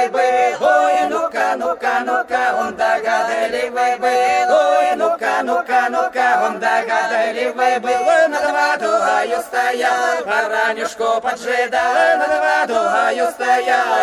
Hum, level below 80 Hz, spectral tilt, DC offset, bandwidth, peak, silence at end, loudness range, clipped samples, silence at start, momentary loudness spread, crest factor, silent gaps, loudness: none; -60 dBFS; -2 dB/octave; under 0.1%; 13.5 kHz; -4 dBFS; 0 s; 1 LU; under 0.1%; 0 s; 5 LU; 12 dB; none; -16 LUFS